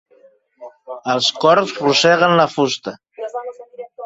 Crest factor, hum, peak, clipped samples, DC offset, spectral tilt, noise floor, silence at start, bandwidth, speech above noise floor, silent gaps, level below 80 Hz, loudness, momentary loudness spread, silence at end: 18 dB; none; 0 dBFS; under 0.1%; under 0.1%; -3.5 dB/octave; -52 dBFS; 0.6 s; 8 kHz; 37 dB; none; -62 dBFS; -15 LUFS; 21 LU; 0 s